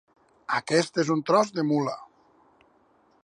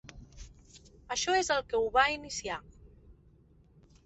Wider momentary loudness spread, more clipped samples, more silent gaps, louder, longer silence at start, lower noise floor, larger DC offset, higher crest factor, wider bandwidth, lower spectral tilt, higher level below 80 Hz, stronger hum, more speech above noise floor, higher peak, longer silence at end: second, 12 LU vs 26 LU; neither; neither; first, -25 LUFS vs -30 LUFS; first, 0.5 s vs 0.05 s; about the same, -63 dBFS vs -61 dBFS; neither; about the same, 20 dB vs 22 dB; first, 11 kHz vs 8.4 kHz; first, -5 dB/octave vs -2 dB/octave; second, -76 dBFS vs -56 dBFS; neither; first, 38 dB vs 31 dB; first, -8 dBFS vs -12 dBFS; first, 1.2 s vs 0.95 s